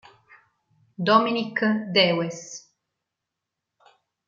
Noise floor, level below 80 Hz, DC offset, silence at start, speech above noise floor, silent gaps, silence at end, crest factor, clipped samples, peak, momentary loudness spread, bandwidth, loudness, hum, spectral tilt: -84 dBFS; -76 dBFS; under 0.1%; 1 s; 62 dB; none; 1.7 s; 22 dB; under 0.1%; -4 dBFS; 18 LU; 7.6 kHz; -22 LUFS; none; -4.5 dB/octave